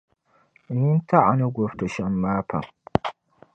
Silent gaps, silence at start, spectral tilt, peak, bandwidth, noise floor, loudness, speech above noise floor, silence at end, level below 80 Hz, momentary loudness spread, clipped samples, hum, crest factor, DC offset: none; 0.7 s; -8.5 dB/octave; 0 dBFS; 8.4 kHz; -61 dBFS; -23 LUFS; 39 dB; 0.45 s; -50 dBFS; 12 LU; under 0.1%; none; 24 dB; under 0.1%